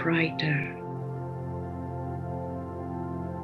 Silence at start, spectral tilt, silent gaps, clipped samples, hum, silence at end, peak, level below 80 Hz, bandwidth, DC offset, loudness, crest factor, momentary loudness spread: 0 s; -8 dB/octave; none; under 0.1%; none; 0 s; -10 dBFS; -60 dBFS; 6.2 kHz; under 0.1%; -32 LUFS; 20 dB; 10 LU